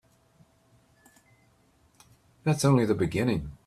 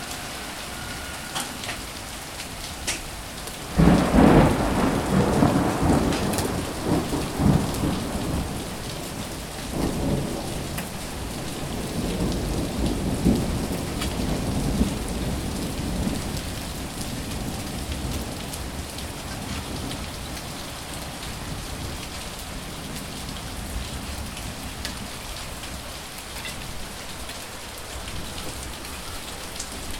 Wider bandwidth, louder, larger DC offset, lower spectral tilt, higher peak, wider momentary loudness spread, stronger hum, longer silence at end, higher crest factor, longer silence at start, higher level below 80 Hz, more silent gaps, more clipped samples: second, 14.5 kHz vs 17.5 kHz; about the same, -26 LUFS vs -27 LUFS; neither; first, -6.5 dB/octave vs -5 dB/octave; second, -10 dBFS vs -2 dBFS; second, 6 LU vs 12 LU; neither; about the same, 0.1 s vs 0 s; about the same, 20 dB vs 24 dB; first, 2.45 s vs 0 s; second, -54 dBFS vs -36 dBFS; neither; neither